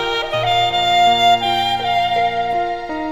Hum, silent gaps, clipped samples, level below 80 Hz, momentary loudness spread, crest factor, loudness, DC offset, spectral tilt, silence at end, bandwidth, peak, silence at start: none; none; under 0.1%; -44 dBFS; 8 LU; 14 dB; -16 LUFS; under 0.1%; -3.5 dB/octave; 0 s; 16.5 kHz; -2 dBFS; 0 s